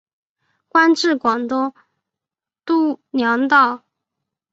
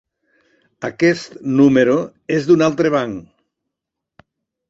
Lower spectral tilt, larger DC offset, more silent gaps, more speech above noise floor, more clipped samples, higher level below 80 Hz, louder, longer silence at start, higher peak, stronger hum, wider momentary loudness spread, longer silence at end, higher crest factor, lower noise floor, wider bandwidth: second, -3.5 dB/octave vs -6.5 dB/octave; neither; neither; first, 72 dB vs 66 dB; neither; second, -66 dBFS vs -56 dBFS; about the same, -17 LUFS vs -16 LUFS; about the same, 0.75 s vs 0.8 s; about the same, -2 dBFS vs -2 dBFS; neither; second, 10 LU vs 15 LU; second, 0.75 s vs 1.5 s; about the same, 18 dB vs 16 dB; first, -88 dBFS vs -82 dBFS; about the same, 8 kHz vs 7.8 kHz